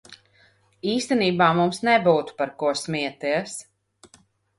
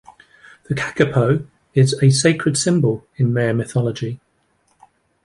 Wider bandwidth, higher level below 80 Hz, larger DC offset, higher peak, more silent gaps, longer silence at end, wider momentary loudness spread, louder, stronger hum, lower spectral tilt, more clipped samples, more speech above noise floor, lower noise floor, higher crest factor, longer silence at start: about the same, 11.5 kHz vs 11.5 kHz; second, -64 dBFS vs -52 dBFS; neither; second, -6 dBFS vs -2 dBFS; neither; second, 0.95 s vs 1.1 s; about the same, 11 LU vs 11 LU; second, -22 LUFS vs -18 LUFS; neither; about the same, -5 dB/octave vs -5.5 dB/octave; neither; second, 37 dB vs 46 dB; about the same, -60 dBFS vs -63 dBFS; about the same, 18 dB vs 18 dB; second, 0.1 s vs 0.7 s